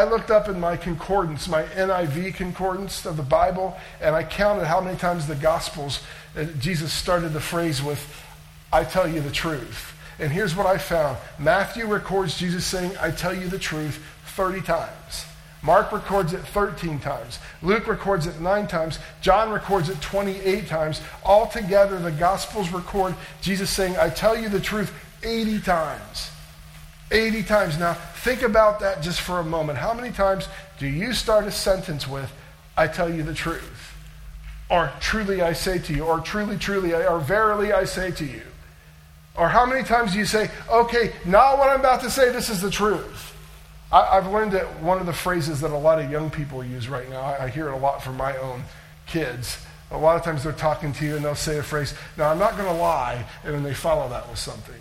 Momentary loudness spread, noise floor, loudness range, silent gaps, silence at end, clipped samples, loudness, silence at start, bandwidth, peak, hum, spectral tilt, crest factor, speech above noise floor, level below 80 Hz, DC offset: 12 LU; -48 dBFS; 5 LU; none; 0 s; under 0.1%; -23 LUFS; 0 s; 16.5 kHz; 0 dBFS; none; -5 dB/octave; 22 dB; 25 dB; -40 dBFS; under 0.1%